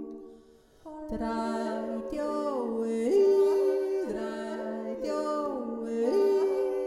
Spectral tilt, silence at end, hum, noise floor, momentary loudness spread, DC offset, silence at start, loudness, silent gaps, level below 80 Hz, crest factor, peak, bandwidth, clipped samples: -6 dB/octave; 0 s; none; -57 dBFS; 11 LU; under 0.1%; 0 s; -29 LUFS; none; -56 dBFS; 14 dB; -14 dBFS; 12 kHz; under 0.1%